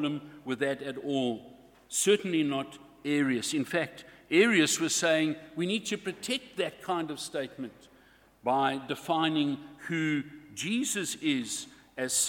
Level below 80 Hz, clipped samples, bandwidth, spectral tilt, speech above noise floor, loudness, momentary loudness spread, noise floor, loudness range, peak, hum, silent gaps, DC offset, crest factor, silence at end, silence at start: -72 dBFS; under 0.1%; 18.5 kHz; -3 dB/octave; 30 dB; -30 LUFS; 12 LU; -60 dBFS; 5 LU; -12 dBFS; none; none; under 0.1%; 20 dB; 0 s; 0 s